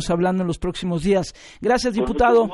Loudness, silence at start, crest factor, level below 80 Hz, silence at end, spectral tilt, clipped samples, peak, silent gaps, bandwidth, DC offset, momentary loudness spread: -21 LUFS; 0 s; 14 dB; -38 dBFS; 0 s; -6 dB/octave; under 0.1%; -6 dBFS; none; 11.5 kHz; under 0.1%; 9 LU